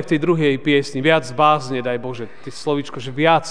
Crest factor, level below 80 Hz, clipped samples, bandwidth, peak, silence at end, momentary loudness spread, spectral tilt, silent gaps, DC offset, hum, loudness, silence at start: 18 dB; -62 dBFS; under 0.1%; 10 kHz; 0 dBFS; 0 s; 12 LU; -5.5 dB/octave; none; 2%; none; -18 LUFS; 0 s